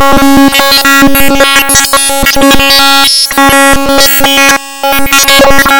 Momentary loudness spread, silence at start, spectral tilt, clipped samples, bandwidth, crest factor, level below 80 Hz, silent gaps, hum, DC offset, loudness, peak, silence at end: 3 LU; 0 s; -2 dB/octave; 7%; over 20 kHz; 4 dB; -22 dBFS; none; none; under 0.1%; -4 LUFS; 0 dBFS; 0 s